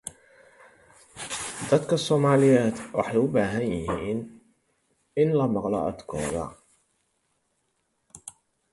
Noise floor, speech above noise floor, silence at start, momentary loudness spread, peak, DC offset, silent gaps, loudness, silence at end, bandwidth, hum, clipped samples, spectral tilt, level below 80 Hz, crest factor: -74 dBFS; 50 dB; 0.05 s; 20 LU; -6 dBFS; under 0.1%; none; -25 LUFS; 0.4 s; 11.5 kHz; none; under 0.1%; -6 dB/octave; -54 dBFS; 20 dB